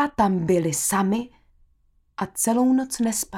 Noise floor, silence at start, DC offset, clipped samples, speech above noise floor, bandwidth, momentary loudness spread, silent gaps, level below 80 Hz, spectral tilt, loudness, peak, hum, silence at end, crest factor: -63 dBFS; 0 s; under 0.1%; under 0.1%; 40 dB; 17.5 kHz; 12 LU; none; -52 dBFS; -4.5 dB/octave; -22 LUFS; -8 dBFS; none; 0 s; 16 dB